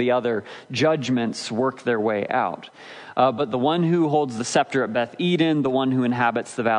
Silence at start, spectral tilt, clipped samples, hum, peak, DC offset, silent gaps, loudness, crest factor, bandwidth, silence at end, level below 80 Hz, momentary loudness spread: 0 s; -5.5 dB/octave; under 0.1%; none; -6 dBFS; under 0.1%; none; -22 LUFS; 16 dB; 10.5 kHz; 0 s; -70 dBFS; 7 LU